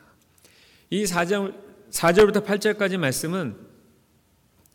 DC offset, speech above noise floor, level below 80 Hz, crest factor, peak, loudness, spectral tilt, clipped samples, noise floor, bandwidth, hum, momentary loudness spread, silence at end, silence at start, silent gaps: under 0.1%; 40 dB; -54 dBFS; 18 dB; -8 dBFS; -23 LUFS; -4.5 dB/octave; under 0.1%; -62 dBFS; 19 kHz; none; 13 LU; 1.1 s; 0.9 s; none